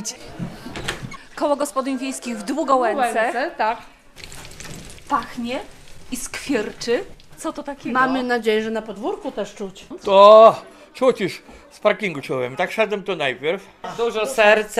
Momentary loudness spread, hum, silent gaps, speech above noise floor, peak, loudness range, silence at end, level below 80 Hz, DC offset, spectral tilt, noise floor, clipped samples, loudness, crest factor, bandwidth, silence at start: 18 LU; none; none; 20 dB; 0 dBFS; 11 LU; 0 s; -50 dBFS; under 0.1%; -4 dB/octave; -39 dBFS; under 0.1%; -19 LUFS; 20 dB; 14.5 kHz; 0 s